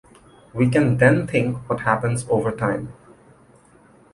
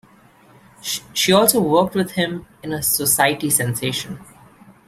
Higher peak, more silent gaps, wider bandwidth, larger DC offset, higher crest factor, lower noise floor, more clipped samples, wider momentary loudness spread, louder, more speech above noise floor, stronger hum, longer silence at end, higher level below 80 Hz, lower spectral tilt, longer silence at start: about the same, -2 dBFS vs 0 dBFS; neither; second, 11.5 kHz vs 16 kHz; neither; about the same, 20 dB vs 20 dB; about the same, -52 dBFS vs -50 dBFS; neither; second, 10 LU vs 16 LU; about the same, -20 LUFS vs -18 LUFS; about the same, 33 dB vs 31 dB; neither; first, 1.2 s vs 0.65 s; about the same, -50 dBFS vs -54 dBFS; first, -7 dB/octave vs -3 dB/octave; second, 0.55 s vs 0.85 s